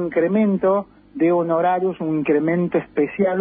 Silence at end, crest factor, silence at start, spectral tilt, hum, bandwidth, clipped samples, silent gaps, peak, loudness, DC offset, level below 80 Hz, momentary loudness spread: 0 s; 12 dB; 0 s; -13 dB/octave; none; 3.7 kHz; under 0.1%; none; -8 dBFS; -20 LUFS; under 0.1%; -58 dBFS; 5 LU